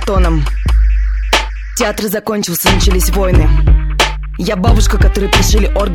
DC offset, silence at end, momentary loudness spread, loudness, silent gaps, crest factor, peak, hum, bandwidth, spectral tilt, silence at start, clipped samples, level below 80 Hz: under 0.1%; 0 s; 6 LU; -13 LUFS; none; 10 dB; 0 dBFS; none; 18 kHz; -4.5 dB/octave; 0 s; under 0.1%; -12 dBFS